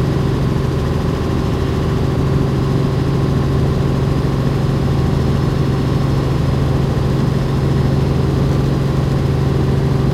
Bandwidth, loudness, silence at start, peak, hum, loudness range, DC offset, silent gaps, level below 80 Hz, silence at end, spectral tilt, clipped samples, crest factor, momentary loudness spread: 12.5 kHz; -16 LUFS; 0 s; -4 dBFS; none; 1 LU; under 0.1%; none; -24 dBFS; 0 s; -8 dB/octave; under 0.1%; 12 dB; 2 LU